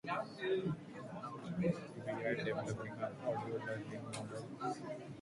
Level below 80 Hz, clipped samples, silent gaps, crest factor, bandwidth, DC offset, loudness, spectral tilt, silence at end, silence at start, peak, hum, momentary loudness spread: -72 dBFS; under 0.1%; none; 18 dB; 11.5 kHz; under 0.1%; -42 LUFS; -6.5 dB/octave; 0 s; 0.05 s; -24 dBFS; none; 8 LU